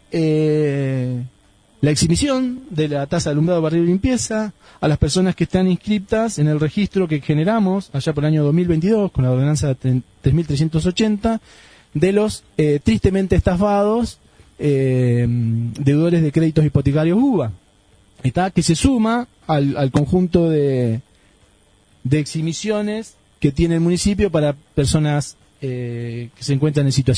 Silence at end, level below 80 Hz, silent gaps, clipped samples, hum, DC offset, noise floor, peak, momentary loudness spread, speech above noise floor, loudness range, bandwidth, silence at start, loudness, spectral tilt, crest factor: 0 s; -36 dBFS; none; under 0.1%; none; under 0.1%; -54 dBFS; 0 dBFS; 8 LU; 37 dB; 2 LU; 10.5 kHz; 0.1 s; -18 LUFS; -6.5 dB/octave; 18 dB